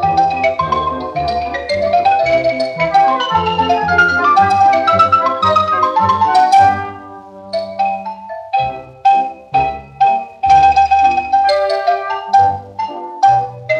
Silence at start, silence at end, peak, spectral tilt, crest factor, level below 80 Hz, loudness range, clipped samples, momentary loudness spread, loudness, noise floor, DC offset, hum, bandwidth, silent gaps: 0 s; 0 s; 0 dBFS; -5 dB/octave; 12 dB; -44 dBFS; 4 LU; under 0.1%; 11 LU; -13 LUFS; -33 dBFS; under 0.1%; none; 9.6 kHz; none